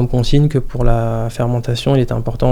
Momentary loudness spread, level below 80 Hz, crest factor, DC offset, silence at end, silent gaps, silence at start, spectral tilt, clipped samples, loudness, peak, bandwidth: 5 LU; -22 dBFS; 14 dB; under 0.1%; 0 s; none; 0 s; -7.5 dB/octave; under 0.1%; -17 LUFS; 0 dBFS; 13 kHz